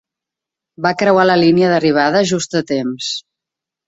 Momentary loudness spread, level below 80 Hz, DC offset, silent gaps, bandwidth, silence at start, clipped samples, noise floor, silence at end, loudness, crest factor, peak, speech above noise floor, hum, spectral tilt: 10 LU; -56 dBFS; under 0.1%; none; 8 kHz; 0.8 s; under 0.1%; -85 dBFS; 0.65 s; -14 LUFS; 14 dB; -2 dBFS; 71 dB; none; -5 dB/octave